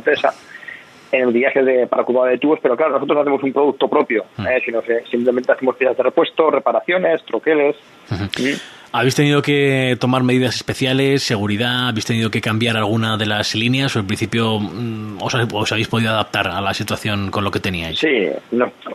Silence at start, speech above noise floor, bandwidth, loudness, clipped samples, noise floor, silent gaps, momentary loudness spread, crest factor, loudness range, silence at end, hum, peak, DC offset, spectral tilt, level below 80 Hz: 0 s; 20 dB; 14 kHz; -17 LUFS; under 0.1%; -37 dBFS; none; 6 LU; 16 dB; 3 LU; 0 s; none; 0 dBFS; under 0.1%; -5.5 dB/octave; -52 dBFS